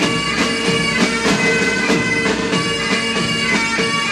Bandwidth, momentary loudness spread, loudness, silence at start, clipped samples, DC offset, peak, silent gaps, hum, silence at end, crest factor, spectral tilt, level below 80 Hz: 14.5 kHz; 2 LU; -16 LUFS; 0 s; under 0.1%; under 0.1%; -2 dBFS; none; none; 0 s; 14 dB; -3.5 dB/octave; -42 dBFS